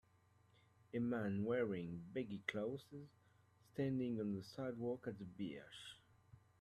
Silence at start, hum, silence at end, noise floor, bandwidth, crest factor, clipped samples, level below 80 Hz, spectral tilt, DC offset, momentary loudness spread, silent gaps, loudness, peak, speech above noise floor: 0.95 s; none; 0.2 s; -74 dBFS; 13 kHz; 22 dB; under 0.1%; -78 dBFS; -7.5 dB/octave; under 0.1%; 15 LU; none; -45 LUFS; -24 dBFS; 30 dB